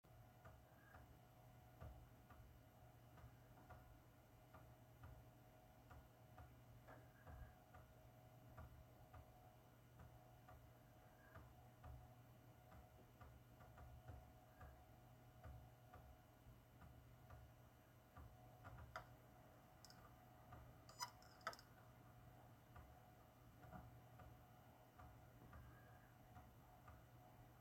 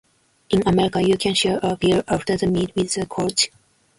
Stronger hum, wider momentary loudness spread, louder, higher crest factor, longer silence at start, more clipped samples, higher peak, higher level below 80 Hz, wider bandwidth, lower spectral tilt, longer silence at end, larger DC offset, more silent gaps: neither; about the same, 6 LU vs 5 LU; second, -65 LUFS vs -20 LUFS; first, 30 dB vs 16 dB; second, 0.05 s vs 0.5 s; neither; second, -34 dBFS vs -4 dBFS; second, -72 dBFS vs -46 dBFS; first, 16.5 kHz vs 11.5 kHz; about the same, -4.5 dB/octave vs -4.5 dB/octave; second, 0 s vs 0.5 s; neither; neither